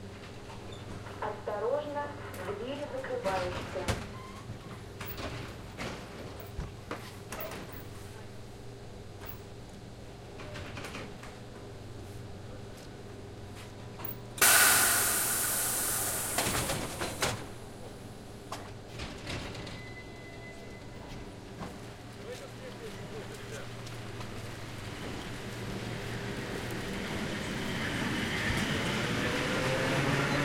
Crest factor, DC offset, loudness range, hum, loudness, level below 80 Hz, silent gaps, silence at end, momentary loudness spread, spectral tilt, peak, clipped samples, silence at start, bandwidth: 26 dB; under 0.1%; 18 LU; none; -32 LUFS; -52 dBFS; none; 0 s; 17 LU; -3 dB/octave; -10 dBFS; under 0.1%; 0 s; 16.5 kHz